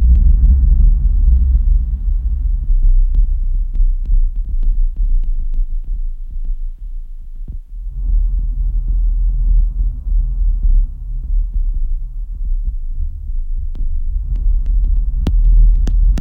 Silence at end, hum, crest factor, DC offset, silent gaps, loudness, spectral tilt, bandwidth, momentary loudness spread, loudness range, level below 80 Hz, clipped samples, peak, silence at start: 0 s; none; 10 dB; under 0.1%; none; -19 LUFS; -9 dB/octave; 0.9 kHz; 14 LU; 8 LU; -14 dBFS; under 0.1%; -2 dBFS; 0 s